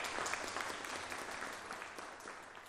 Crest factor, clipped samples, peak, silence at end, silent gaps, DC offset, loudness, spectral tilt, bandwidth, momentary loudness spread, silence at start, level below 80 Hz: 24 dB; under 0.1%; -20 dBFS; 0 s; none; under 0.1%; -43 LUFS; -1 dB/octave; 15.5 kHz; 9 LU; 0 s; -70 dBFS